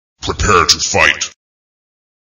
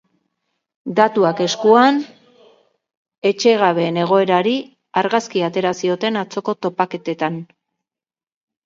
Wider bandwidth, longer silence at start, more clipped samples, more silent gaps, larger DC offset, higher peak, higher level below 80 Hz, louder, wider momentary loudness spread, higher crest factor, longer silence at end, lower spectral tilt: first, over 20 kHz vs 7.6 kHz; second, 0.2 s vs 0.85 s; first, 0.1% vs under 0.1%; second, none vs 2.97-3.05 s, 3.18-3.22 s; neither; about the same, 0 dBFS vs 0 dBFS; first, -32 dBFS vs -70 dBFS; first, -11 LUFS vs -17 LUFS; first, 13 LU vs 10 LU; about the same, 16 dB vs 18 dB; about the same, 1.1 s vs 1.2 s; second, -2 dB/octave vs -5 dB/octave